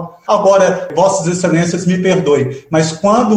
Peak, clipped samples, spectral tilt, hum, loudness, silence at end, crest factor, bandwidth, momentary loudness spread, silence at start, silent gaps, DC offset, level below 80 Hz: -2 dBFS; under 0.1%; -5.5 dB/octave; none; -13 LUFS; 0 s; 12 dB; 10.5 kHz; 5 LU; 0 s; none; under 0.1%; -50 dBFS